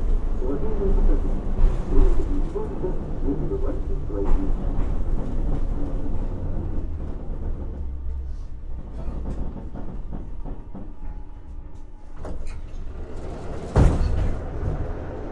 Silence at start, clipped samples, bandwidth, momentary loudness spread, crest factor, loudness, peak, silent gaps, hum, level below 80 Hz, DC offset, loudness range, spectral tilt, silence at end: 0 s; under 0.1%; 4.5 kHz; 14 LU; 18 dB; -29 LUFS; -4 dBFS; none; none; -24 dBFS; under 0.1%; 11 LU; -9 dB/octave; 0 s